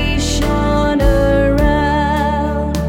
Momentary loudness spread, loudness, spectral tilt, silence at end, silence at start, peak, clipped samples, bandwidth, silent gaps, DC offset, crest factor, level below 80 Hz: 4 LU; -15 LUFS; -6 dB/octave; 0 s; 0 s; 0 dBFS; under 0.1%; 16.5 kHz; none; under 0.1%; 14 dB; -20 dBFS